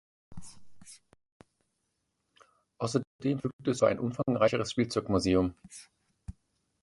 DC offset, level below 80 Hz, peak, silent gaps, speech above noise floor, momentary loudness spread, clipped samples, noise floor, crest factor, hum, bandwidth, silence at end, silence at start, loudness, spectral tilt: under 0.1%; -54 dBFS; -12 dBFS; 1.32-1.40 s, 3.07-3.19 s, 3.53-3.59 s; 51 dB; 23 LU; under 0.1%; -80 dBFS; 20 dB; none; 11.5 kHz; 0.5 s; 0.3 s; -30 LUFS; -6 dB/octave